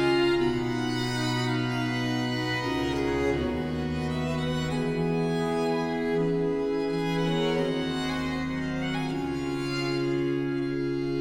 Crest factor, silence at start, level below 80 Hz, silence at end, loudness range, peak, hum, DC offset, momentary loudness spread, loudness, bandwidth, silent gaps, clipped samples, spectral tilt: 16 dB; 0 s; -48 dBFS; 0 s; 1 LU; -12 dBFS; none; under 0.1%; 4 LU; -28 LUFS; 16.5 kHz; none; under 0.1%; -6 dB/octave